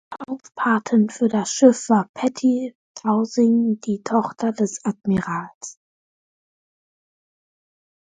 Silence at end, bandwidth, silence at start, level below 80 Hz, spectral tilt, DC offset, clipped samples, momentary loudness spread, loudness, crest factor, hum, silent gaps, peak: 2.3 s; 9.4 kHz; 0.1 s; -62 dBFS; -5.5 dB/octave; under 0.1%; under 0.1%; 16 LU; -20 LUFS; 20 dB; none; 2.09-2.14 s, 2.75-2.95 s, 5.55-5.61 s; -2 dBFS